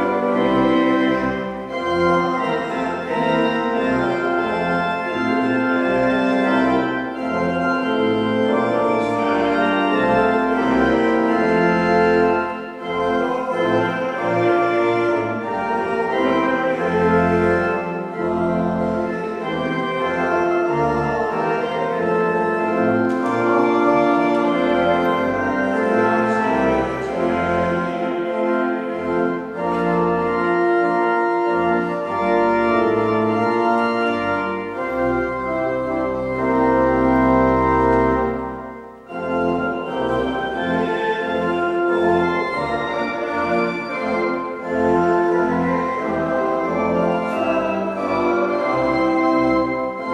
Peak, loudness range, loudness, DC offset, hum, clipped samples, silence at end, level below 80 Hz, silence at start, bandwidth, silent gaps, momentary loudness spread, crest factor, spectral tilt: -4 dBFS; 3 LU; -19 LUFS; under 0.1%; none; under 0.1%; 0 s; -44 dBFS; 0 s; 9.6 kHz; none; 6 LU; 14 dB; -7 dB/octave